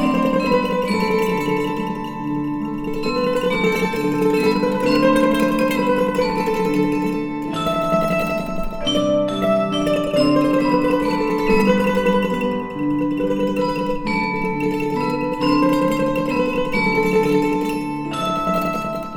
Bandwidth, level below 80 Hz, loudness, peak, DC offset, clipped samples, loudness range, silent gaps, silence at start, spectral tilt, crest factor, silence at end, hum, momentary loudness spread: 18.5 kHz; -40 dBFS; -19 LUFS; -2 dBFS; under 0.1%; under 0.1%; 3 LU; none; 0 s; -6 dB/octave; 16 dB; 0 s; none; 7 LU